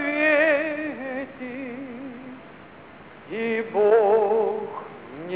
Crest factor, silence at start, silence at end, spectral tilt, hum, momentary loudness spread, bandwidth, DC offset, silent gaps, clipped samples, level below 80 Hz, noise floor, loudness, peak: 16 dB; 0 s; 0 s; -8.5 dB/octave; none; 20 LU; 4 kHz; 0.1%; none; under 0.1%; -66 dBFS; -45 dBFS; -22 LUFS; -8 dBFS